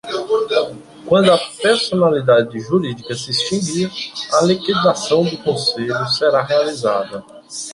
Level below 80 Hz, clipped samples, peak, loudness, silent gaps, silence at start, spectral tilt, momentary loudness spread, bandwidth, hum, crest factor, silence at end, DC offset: -56 dBFS; under 0.1%; -2 dBFS; -17 LUFS; none; 0.05 s; -4.5 dB/octave; 11 LU; 11.5 kHz; none; 16 dB; 0 s; under 0.1%